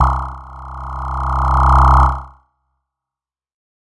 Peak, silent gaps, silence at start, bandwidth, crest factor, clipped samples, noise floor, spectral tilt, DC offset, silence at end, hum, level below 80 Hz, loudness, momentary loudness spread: 0 dBFS; none; 0 s; 7.6 kHz; 16 dB; under 0.1%; -90 dBFS; -7.5 dB/octave; under 0.1%; 1.5 s; none; -20 dBFS; -14 LUFS; 20 LU